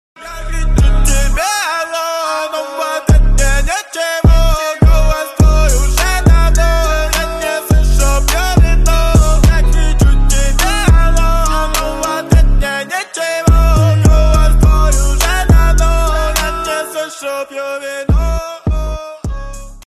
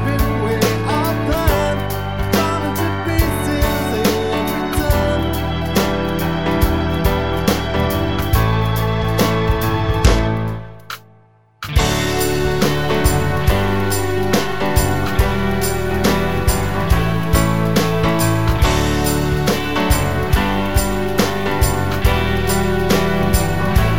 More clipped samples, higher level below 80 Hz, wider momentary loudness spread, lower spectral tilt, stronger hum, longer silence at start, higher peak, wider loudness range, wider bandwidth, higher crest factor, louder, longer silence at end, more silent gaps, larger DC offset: neither; first, -12 dBFS vs -24 dBFS; first, 10 LU vs 3 LU; about the same, -4.5 dB/octave vs -5.5 dB/octave; neither; first, 0.2 s vs 0 s; about the same, 0 dBFS vs 0 dBFS; about the same, 3 LU vs 2 LU; second, 13.5 kHz vs 17 kHz; second, 10 dB vs 16 dB; first, -13 LUFS vs -17 LUFS; first, 0.15 s vs 0 s; neither; second, under 0.1% vs 2%